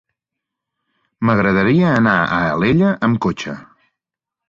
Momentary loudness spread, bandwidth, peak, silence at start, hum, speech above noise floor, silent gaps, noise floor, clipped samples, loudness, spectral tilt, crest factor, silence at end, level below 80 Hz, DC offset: 10 LU; 7.4 kHz; -2 dBFS; 1.2 s; none; 70 dB; none; -85 dBFS; under 0.1%; -16 LUFS; -7.5 dB/octave; 16 dB; 0.85 s; -46 dBFS; under 0.1%